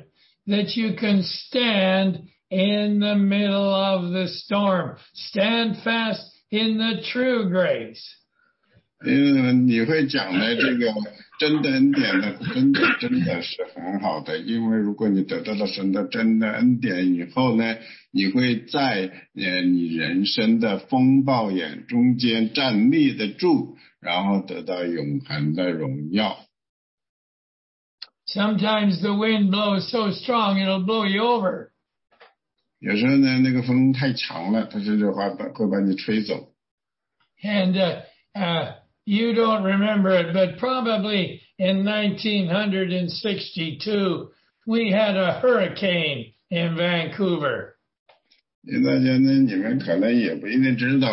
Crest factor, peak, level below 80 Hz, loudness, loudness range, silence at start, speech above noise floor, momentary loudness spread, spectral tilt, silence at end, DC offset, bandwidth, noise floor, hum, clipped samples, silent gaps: 14 dB; -8 dBFS; -66 dBFS; -22 LUFS; 4 LU; 0.45 s; 53 dB; 9 LU; -9 dB/octave; 0 s; under 0.1%; 6 kHz; -75 dBFS; none; under 0.1%; 26.69-26.98 s, 27.09-27.98 s, 36.71-36.78 s, 47.99-48.06 s, 48.55-48.62 s